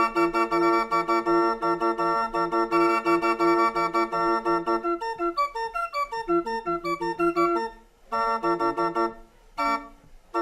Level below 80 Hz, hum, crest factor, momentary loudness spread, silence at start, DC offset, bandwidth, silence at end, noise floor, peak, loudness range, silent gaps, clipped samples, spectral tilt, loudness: -54 dBFS; none; 16 dB; 7 LU; 0 s; under 0.1%; 12 kHz; 0 s; -49 dBFS; -10 dBFS; 4 LU; none; under 0.1%; -5.5 dB/octave; -25 LUFS